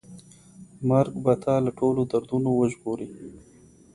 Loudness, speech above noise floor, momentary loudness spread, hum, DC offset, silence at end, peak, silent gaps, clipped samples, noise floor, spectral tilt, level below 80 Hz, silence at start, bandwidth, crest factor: -25 LUFS; 25 dB; 13 LU; none; under 0.1%; 0.55 s; -6 dBFS; none; under 0.1%; -49 dBFS; -8.5 dB/octave; -58 dBFS; 0.1 s; 11.5 kHz; 20 dB